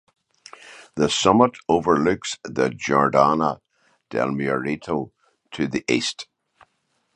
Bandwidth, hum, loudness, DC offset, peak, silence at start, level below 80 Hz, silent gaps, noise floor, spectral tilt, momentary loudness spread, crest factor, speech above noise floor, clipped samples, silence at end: 10.5 kHz; none; -21 LUFS; under 0.1%; -2 dBFS; 0.65 s; -54 dBFS; none; -70 dBFS; -4.5 dB/octave; 19 LU; 22 dB; 50 dB; under 0.1%; 0.9 s